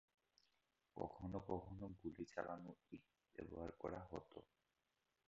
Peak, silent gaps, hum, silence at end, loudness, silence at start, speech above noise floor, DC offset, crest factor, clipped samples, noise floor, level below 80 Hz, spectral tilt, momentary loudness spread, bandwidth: -30 dBFS; none; none; 0.85 s; -53 LUFS; 0.95 s; 37 dB; under 0.1%; 24 dB; under 0.1%; -89 dBFS; -70 dBFS; -7 dB/octave; 13 LU; 7.4 kHz